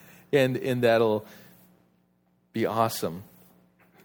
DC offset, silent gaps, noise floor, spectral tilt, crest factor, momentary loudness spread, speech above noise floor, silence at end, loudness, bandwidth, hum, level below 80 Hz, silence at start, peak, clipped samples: under 0.1%; none; -68 dBFS; -5.5 dB/octave; 20 dB; 12 LU; 43 dB; 0.8 s; -26 LUFS; over 20 kHz; none; -70 dBFS; 0.3 s; -8 dBFS; under 0.1%